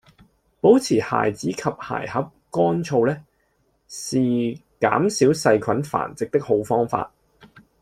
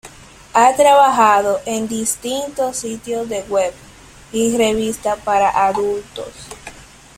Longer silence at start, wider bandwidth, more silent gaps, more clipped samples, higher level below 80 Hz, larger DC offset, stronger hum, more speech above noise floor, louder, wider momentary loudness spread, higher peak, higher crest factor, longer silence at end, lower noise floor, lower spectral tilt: first, 0.65 s vs 0.05 s; second, 14.5 kHz vs 16.5 kHz; neither; neither; second, -58 dBFS vs -48 dBFS; neither; neither; first, 46 dB vs 24 dB; second, -21 LUFS vs -16 LUFS; second, 11 LU vs 20 LU; about the same, -2 dBFS vs -2 dBFS; about the same, 20 dB vs 16 dB; first, 0.75 s vs 0.35 s; first, -66 dBFS vs -40 dBFS; first, -5.5 dB/octave vs -3 dB/octave